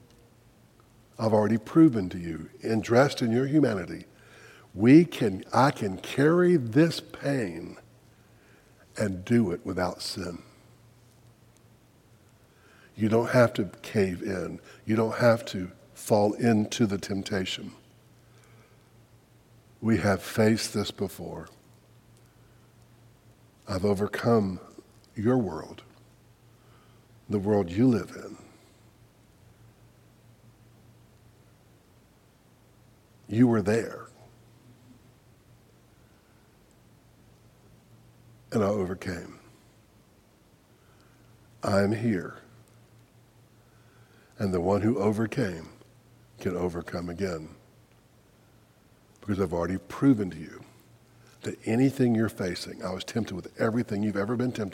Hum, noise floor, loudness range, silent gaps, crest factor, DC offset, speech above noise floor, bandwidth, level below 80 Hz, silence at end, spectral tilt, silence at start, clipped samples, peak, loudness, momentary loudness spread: none; -60 dBFS; 10 LU; none; 24 dB; under 0.1%; 34 dB; 16.5 kHz; -62 dBFS; 0 s; -6.5 dB/octave; 1.2 s; under 0.1%; -6 dBFS; -27 LUFS; 18 LU